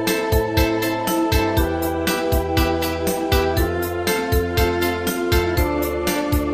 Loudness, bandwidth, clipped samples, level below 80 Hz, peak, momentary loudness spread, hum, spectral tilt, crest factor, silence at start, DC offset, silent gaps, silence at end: -20 LUFS; 15.5 kHz; under 0.1%; -28 dBFS; -4 dBFS; 3 LU; none; -5 dB/octave; 16 dB; 0 s; under 0.1%; none; 0 s